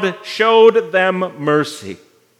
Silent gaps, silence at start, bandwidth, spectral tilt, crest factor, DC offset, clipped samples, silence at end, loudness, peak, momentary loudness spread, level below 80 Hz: none; 0 s; 12 kHz; -5 dB/octave; 14 dB; under 0.1%; under 0.1%; 0.45 s; -14 LUFS; 0 dBFS; 16 LU; -76 dBFS